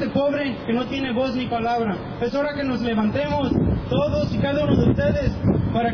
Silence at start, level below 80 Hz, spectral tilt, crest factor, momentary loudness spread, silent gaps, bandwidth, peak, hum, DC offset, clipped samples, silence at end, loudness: 0 s; -36 dBFS; -8 dB/octave; 16 dB; 5 LU; none; 5.4 kHz; -6 dBFS; none; under 0.1%; under 0.1%; 0 s; -22 LUFS